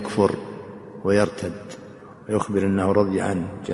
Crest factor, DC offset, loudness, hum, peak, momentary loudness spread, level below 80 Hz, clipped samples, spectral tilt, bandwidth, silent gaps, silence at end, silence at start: 20 dB; under 0.1%; -23 LUFS; none; -4 dBFS; 19 LU; -54 dBFS; under 0.1%; -6.5 dB/octave; 11.5 kHz; none; 0 s; 0 s